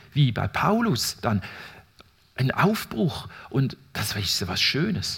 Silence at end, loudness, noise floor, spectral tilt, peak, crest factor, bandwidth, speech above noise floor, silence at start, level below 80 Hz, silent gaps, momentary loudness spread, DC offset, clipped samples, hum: 0 s; -24 LUFS; -56 dBFS; -4.5 dB/octave; -6 dBFS; 18 dB; 17.5 kHz; 31 dB; 0.15 s; -54 dBFS; none; 12 LU; under 0.1%; under 0.1%; none